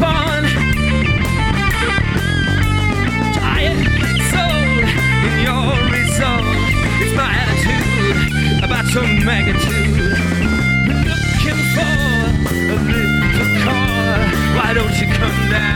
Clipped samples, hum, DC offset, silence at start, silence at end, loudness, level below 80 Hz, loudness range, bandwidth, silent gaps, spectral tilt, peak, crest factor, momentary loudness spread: under 0.1%; none; under 0.1%; 0 s; 0 s; -15 LUFS; -24 dBFS; 1 LU; 18.5 kHz; none; -5 dB/octave; -2 dBFS; 12 dB; 2 LU